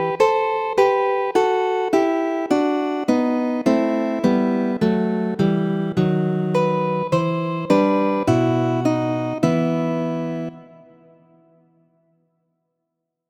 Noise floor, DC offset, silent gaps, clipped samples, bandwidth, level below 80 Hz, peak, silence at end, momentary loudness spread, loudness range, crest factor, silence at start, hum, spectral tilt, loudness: -79 dBFS; under 0.1%; none; under 0.1%; 14.5 kHz; -58 dBFS; -4 dBFS; 2.65 s; 4 LU; 6 LU; 18 dB; 0 s; none; -7.5 dB/octave; -20 LUFS